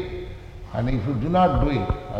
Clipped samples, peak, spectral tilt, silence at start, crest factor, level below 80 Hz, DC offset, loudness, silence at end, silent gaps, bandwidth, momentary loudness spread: under 0.1%; -8 dBFS; -9 dB/octave; 0 s; 16 dB; -32 dBFS; under 0.1%; -23 LUFS; 0 s; none; 7.8 kHz; 17 LU